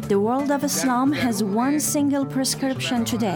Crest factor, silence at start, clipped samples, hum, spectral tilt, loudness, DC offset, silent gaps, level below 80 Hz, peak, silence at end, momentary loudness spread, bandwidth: 12 dB; 0 s; under 0.1%; none; -4 dB/octave; -22 LUFS; under 0.1%; none; -56 dBFS; -10 dBFS; 0 s; 3 LU; over 20 kHz